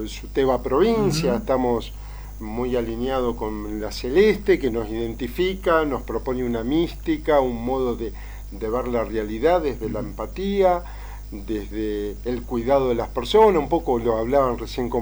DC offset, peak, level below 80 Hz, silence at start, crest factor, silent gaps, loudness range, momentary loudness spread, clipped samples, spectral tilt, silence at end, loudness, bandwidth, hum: under 0.1%; -6 dBFS; -36 dBFS; 0 s; 18 dB; none; 3 LU; 12 LU; under 0.1%; -6 dB/octave; 0 s; -23 LUFS; over 20 kHz; 50 Hz at -35 dBFS